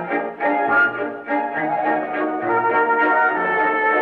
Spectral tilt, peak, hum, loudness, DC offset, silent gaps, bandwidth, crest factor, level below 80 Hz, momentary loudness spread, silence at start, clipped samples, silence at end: -7.5 dB/octave; -6 dBFS; none; -19 LUFS; under 0.1%; none; 5.4 kHz; 12 dB; -66 dBFS; 7 LU; 0 s; under 0.1%; 0 s